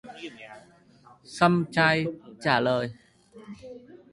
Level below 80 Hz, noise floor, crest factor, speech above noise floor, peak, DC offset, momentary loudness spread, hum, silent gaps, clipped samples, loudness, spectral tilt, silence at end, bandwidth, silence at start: -64 dBFS; -56 dBFS; 22 dB; 31 dB; -6 dBFS; under 0.1%; 23 LU; none; none; under 0.1%; -25 LUFS; -6 dB/octave; 0.15 s; 11.5 kHz; 0.05 s